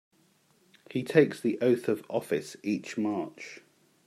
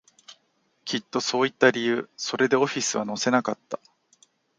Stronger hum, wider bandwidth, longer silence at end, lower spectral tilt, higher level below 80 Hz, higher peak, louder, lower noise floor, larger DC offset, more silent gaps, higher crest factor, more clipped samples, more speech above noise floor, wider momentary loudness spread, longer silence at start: neither; first, 14 kHz vs 9.6 kHz; second, 0.5 s vs 0.85 s; first, -6.5 dB/octave vs -3 dB/octave; about the same, -78 dBFS vs -74 dBFS; second, -6 dBFS vs -2 dBFS; second, -29 LUFS vs -24 LUFS; about the same, -66 dBFS vs -69 dBFS; neither; neither; about the same, 24 dB vs 24 dB; neither; second, 38 dB vs 45 dB; first, 16 LU vs 13 LU; first, 0.9 s vs 0.3 s